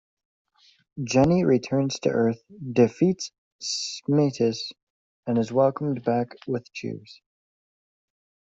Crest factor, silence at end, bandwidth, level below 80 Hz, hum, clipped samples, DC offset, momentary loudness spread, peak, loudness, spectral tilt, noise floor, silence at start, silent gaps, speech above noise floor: 18 dB; 1.3 s; 8 kHz; -58 dBFS; none; under 0.1%; under 0.1%; 15 LU; -6 dBFS; -24 LUFS; -6 dB/octave; under -90 dBFS; 0.95 s; 3.38-3.59 s, 4.83-5.23 s; over 66 dB